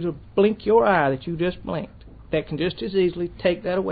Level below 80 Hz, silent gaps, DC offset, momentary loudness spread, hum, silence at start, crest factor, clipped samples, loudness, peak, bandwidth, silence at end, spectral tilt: -46 dBFS; none; under 0.1%; 11 LU; none; 0 s; 16 dB; under 0.1%; -23 LUFS; -6 dBFS; 4.9 kHz; 0 s; -11 dB/octave